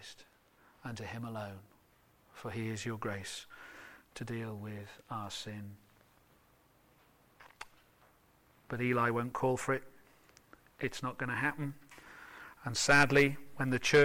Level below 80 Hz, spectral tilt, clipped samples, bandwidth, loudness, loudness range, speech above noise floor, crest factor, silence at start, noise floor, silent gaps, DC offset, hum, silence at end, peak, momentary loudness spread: -62 dBFS; -4.5 dB/octave; under 0.1%; 16.5 kHz; -34 LUFS; 16 LU; 34 dB; 22 dB; 0 s; -68 dBFS; none; under 0.1%; none; 0 s; -14 dBFS; 24 LU